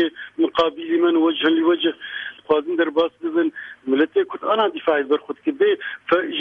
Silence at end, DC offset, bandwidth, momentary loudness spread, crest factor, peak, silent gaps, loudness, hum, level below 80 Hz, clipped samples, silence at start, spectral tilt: 0 s; under 0.1%; 5.2 kHz; 7 LU; 14 dB; -6 dBFS; none; -20 LUFS; none; -64 dBFS; under 0.1%; 0 s; -6 dB/octave